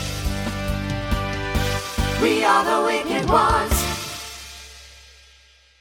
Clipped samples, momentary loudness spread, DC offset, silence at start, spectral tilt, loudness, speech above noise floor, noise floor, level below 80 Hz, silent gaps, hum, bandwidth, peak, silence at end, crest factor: under 0.1%; 17 LU; under 0.1%; 0 s; -4.5 dB/octave; -21 LUFS; 35 dB; -53 dBFS; -32 dBFS; none; none; 18 kHz; -2 dBFS; 0.8 s; 20 dB